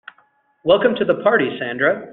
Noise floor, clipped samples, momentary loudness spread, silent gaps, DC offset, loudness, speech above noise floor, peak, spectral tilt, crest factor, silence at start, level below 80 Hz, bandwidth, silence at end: -59 dBFS; under 0.1%; 6 LU; none; under 0.1%; -18 LUFS; 42 dB; -2 dBFS; -8.5 dB/octave; 16 dB; 0.65 s; -58 dBFS; 4.2 kHz; 0 s